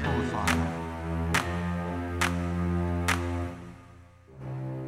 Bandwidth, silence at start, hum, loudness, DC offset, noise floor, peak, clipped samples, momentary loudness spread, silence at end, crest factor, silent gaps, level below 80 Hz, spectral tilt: 16 kHz; 0 s; none; -30 LUFS; under 0.1%; -52 dBFS; -12 dBFS; under 0.1%; 12 LU; 0 s; 18 dB; none; -42 dBFS; -5 dB/octave